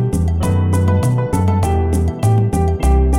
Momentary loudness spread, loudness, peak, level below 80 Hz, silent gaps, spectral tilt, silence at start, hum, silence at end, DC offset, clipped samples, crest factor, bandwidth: 2 LU; -16 LUFS; -4 dBFS; -20 dBFS; none; -7.5 dB/octave; 0 s; none; 0 s; under 0.1%; under 0.1%; 10 dB; 14.5 kHz